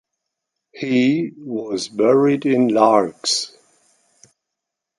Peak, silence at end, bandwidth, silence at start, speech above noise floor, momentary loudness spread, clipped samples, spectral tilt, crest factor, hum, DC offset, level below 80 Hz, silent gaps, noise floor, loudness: -2 dBFS; 1.5 s; 11.5 kHz; 0.75 s; 64 dB; 12 LU; under 0.1%; -4.5 dB/octave; 18 dB; none; under 0.1%; -68 dBFS; none; -82 dBFS; -18 LUFS